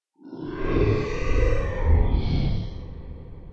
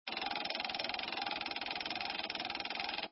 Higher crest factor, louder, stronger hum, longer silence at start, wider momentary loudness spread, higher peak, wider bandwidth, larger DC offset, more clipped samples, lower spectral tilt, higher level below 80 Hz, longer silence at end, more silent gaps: about the same, 16 dB vs 18 dB; first, -25 LUFS vs -38 LUFS; neither; first, 0.25 s vs 0.05 s; first, 18 LU vs 1 LU; first, -8 dBFS vs -22 dBFS; first, 7 kHz vs 6 kHz; neither; neither; first, -8 dB/octave vs -5 dB/octave; first, -26 dBFS vs -70 dBFS; about the same, 0.05 s vs 0 s; neither